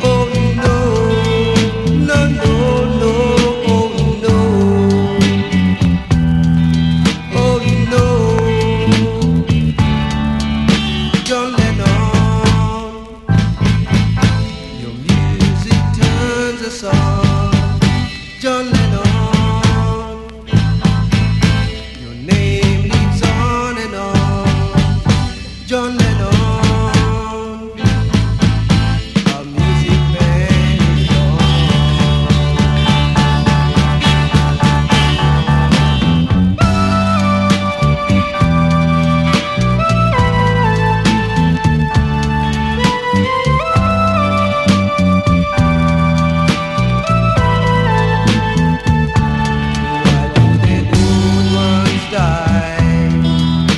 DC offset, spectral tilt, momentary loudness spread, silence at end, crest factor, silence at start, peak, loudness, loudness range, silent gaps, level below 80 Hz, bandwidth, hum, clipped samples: 0.2%; -6.5 dB/octave; 4 LU; 0 s; 12 dB; 0 s; 0 dBFS; -13 LUFS; 3 LU; none; -24 dBFS; 12 kHz; none; under 0.1%